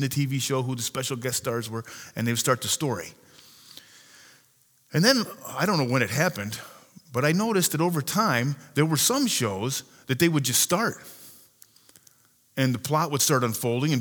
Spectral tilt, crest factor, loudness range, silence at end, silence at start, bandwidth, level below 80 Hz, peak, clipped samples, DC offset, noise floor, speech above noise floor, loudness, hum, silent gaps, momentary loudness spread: -4 dB/octave; 20 dB; 5 LU; 0 s; 0 s; over 20 kHz; -68 dBFS; -6 dBFS; under 0.1%; under 0.1%; -62 dBFS; 37 dB; -25 LUFS; none; none; 13 LU